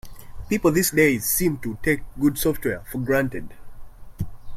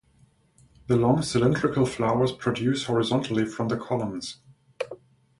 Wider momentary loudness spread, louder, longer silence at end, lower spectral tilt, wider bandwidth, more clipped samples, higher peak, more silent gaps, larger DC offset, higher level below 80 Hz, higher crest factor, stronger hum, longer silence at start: first, 17 LU vs 14 LU; first, -22 LUFS vs -25 LUFS; second, 0 s vs 0.45 s; second, -4.5 dB/octave vs -6 dB/octave; first, 16.5 kHz vs 11.5 kHz; neither; about the same, -6 dBFS vs -8 dBFS; neither; neither; first, -40 dBFS vs -54 dBFS; about the same, 18 dB vs 18 dB; neither; second, 0.05 s vs 0.9 s